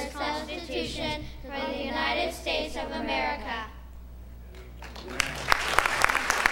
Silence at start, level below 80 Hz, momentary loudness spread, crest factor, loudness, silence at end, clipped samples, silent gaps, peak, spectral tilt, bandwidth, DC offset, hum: 0 s; -44 dBFS; 22 LU; 30 dB; -28 LUFS; 0 s; under 0.1%; none; 0 dBFS; -2.5 dB/octave; 16.5 kHz; under 0.1%; none